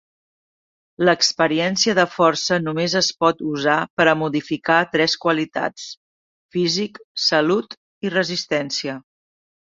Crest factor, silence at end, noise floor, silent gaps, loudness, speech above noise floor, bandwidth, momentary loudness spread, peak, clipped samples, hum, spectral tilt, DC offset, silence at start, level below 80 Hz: 20 dB; 0.7 s; under -90 dBFS; 3.90-3.97 s, 5.97-6.49 s, 7.04-7.15 s, 7.77-8.01 s; -19 LUFS; over 70 dB; 7.8 kHz; 11 LU; -2 dBFS; under 0.1%; none; -3.5 dB/octave; under 0.1%; 1 s; -62 dBFS